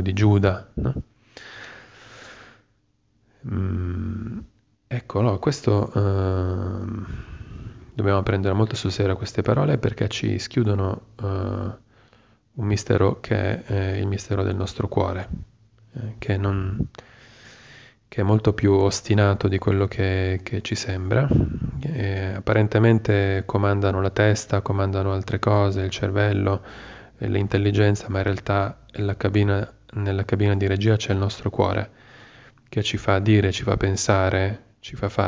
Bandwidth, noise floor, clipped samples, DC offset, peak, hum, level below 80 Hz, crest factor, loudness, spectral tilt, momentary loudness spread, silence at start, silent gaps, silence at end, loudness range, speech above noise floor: 8 kHz; -66 dBFS; under 0.1%; under 0.1%; -4 dBFS; none; -38 dBFS; 18 dB; -23 LUFS; -6.5 dB/octave; 15 LU; 0 s; none; 0 s; 6 LU; 44 dB